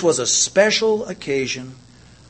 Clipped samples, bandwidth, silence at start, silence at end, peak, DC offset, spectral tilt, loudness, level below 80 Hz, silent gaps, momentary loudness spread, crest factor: under 0.1%; 8.8 kHz; 0 s; 0.55 s; 0 dBFS; under 0.1%; -2 dB/octave; -18 LUFS; -56 dBFS; none; 12 LU; 20 dB